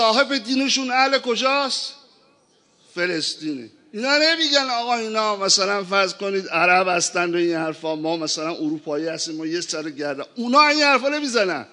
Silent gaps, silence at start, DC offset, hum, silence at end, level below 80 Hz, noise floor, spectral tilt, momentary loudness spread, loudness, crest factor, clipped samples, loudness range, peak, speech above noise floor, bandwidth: none; 0 s; under 0.1%; none; 0.1 s; -80 dBFS; -59 dBFS; -2 dB/octave; 11 LU; -20 LUFS; 20 dB; under 0.1%; 5 LU; -2 dBFS; 38 dB; 11 kHz